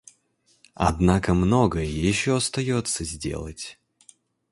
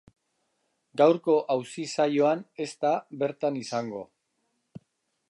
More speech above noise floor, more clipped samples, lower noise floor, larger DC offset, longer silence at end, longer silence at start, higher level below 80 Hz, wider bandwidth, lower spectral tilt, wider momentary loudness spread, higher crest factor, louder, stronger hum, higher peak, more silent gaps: second, 43 dB vs 50 dB; neither; second, -66 dBFS vs -76 dBFS; neither; second, 0.8 s vs 1.25 s; second, 0.8 s vs 0.95 s; first, -38 dBFS vs -78 dBFS; about the same, 11.5 kHz vs 11.5 kHz; about the same, -5 dB/octave vs -5.5 dB/octave; about the same, 13 LU vs 13 LU; about the same, 20 dB vs 20 dB; first, -23 LUFS vs -27 LUFS; neither; first, -4 dBFS vs -8 dBFS; neither